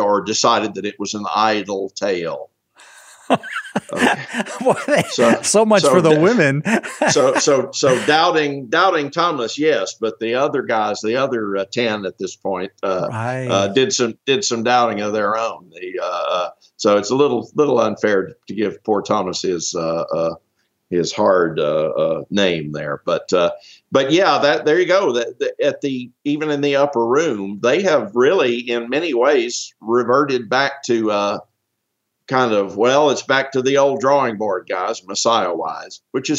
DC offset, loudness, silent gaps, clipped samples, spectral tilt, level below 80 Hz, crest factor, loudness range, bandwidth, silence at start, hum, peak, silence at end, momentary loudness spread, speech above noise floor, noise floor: under 0.1%; -18 LUFS; none; under 0.1%; -4 dB/octave; -66 dBFS; 16 dB; 5 LU; 13.5 kHz; 0 s; none; -2 dBFS; 0 s; 10 LU; 57 dB; -75 dBFS